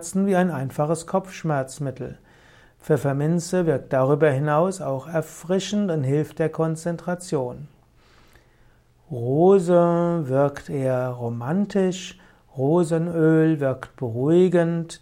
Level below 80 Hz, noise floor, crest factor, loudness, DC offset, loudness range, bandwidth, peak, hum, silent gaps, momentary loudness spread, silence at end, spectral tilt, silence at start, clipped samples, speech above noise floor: -58 dBFS; -56 dBFS; 16 dB; -22 LUFS; under 0.1%; 5 LU; 15.5 kHz; -6 dBFS; none; none; 12 LU; 0.05 s; -7 dB/octave; 0 s; under 0.1%; 35 dB